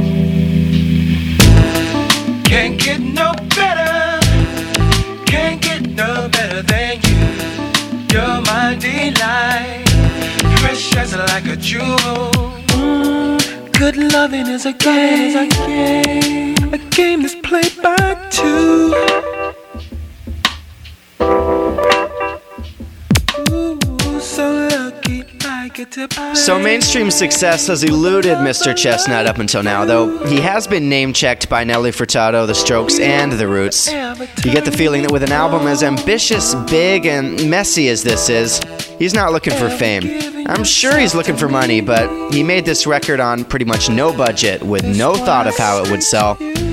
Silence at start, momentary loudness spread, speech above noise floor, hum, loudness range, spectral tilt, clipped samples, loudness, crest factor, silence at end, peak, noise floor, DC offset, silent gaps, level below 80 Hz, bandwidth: 0 s; 6 LU; 23 dB; none; 4 LU; -4 dB/octave; under 0.1%; -14 LUFS; 14 dB; 0 s; 0 dBFS; -37 dBFS; under 0.1%; none; -28 dBFS; 18.5 kHz